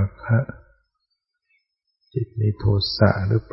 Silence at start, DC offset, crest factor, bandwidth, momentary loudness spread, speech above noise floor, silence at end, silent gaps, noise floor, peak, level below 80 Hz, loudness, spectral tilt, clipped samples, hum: 0 s; under 0.1%; 20 dB; 5.8 kHz; 12 LU; 56 dB; 0.1 s; none; -77 dBFS; -4 dBFS; -44 dBFS; -22 LUFS; -10 dB/octave; under 0.1%; none